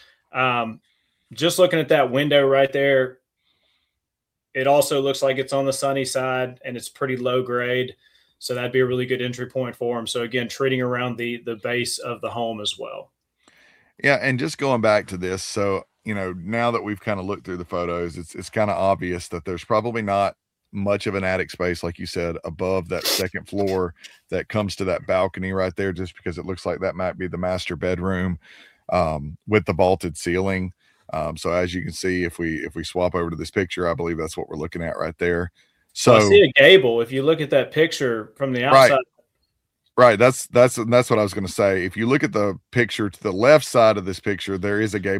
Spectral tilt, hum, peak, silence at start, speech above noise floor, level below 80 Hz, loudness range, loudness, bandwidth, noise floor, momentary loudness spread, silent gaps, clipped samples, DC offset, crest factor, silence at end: -5 dB/octave; none; 0 dBFS; 0.35 s; 62 dB; -50 dBFS; 9 LU; -21 LUFS; 16 kHz; -83 dBFS; 13 LU; none; under 0.1%; under 0.1%; 22 dB; 0 s